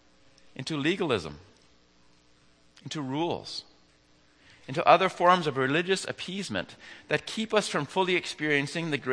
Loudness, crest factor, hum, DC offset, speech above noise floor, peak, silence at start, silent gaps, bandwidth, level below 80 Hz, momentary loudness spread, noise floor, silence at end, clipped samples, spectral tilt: -27 LUFS; 26 dB; none; under 0.1%; 34 dB; -4 dBFS; 0.6 s; none; 10.5 kHz; -66 dBFS; 17 LU; -62 dBFS; 0 s; under 0.1%; -4.5 dB/octave